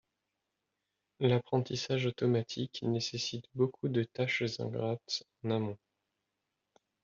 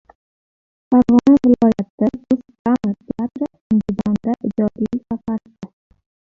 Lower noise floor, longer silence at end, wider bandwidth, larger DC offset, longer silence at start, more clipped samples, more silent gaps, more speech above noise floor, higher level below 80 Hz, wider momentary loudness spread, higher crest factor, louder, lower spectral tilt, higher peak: second, -86 dBFS vs under -90 dBFS; first, 1.3 s vs 0.65 s; about the same, 7.6 kHz vs 7 kHz; neither; first, 1.2 s vs 0.9 s; neither; second, none vs 1.90-1.98 s, 2.59-2.65 s, 3.61-3.70 s; second, 52 dB vs over 76 dB; second, -72 dBFS vs -48 dBFS; second, 6 LU vs 14 LU; about the same, 20 dB vs 16 dB; second, -34 LUFS vs -18 LUFS; second, -5 dB/octave vs -9 dB/octave; second, -16 dBFS vs -2 dBFS